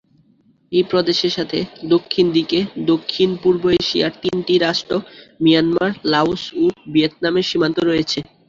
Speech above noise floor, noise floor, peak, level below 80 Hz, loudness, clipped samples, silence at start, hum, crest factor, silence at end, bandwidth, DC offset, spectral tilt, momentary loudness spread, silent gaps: 39 dB; -56 dBFS; -2 dBFS; -52 dBFS; -18 LUFS; under 0.1%; 0.7 s; none; 16 dB; 0.25 s; 7.6 kHz; under 0.1%; -5.5 dB/octave; 5 LU; none